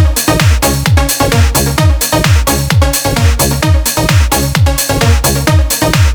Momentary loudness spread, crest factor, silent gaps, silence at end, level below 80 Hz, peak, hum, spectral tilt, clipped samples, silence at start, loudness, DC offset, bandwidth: 1 LU; 10 dB; none; 0 s; -14 dBFS; 0 dBFS; none; -4 dB/octave; under 0.1%; 0 s; -10 LUFS; under 0.1%; over 20 kHz